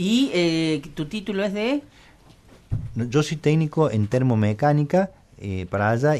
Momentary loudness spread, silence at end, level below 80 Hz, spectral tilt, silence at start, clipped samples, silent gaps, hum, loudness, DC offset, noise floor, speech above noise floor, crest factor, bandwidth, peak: 10 LU; 0 s; -48 dBFS; -6.5 dB/octave; 0 s; under 0.1%; none; none; -23 LUFS; under 0.1%; -50 dBFS; 29 dB; 16 dB; 12.5 kHz; -8 dBFS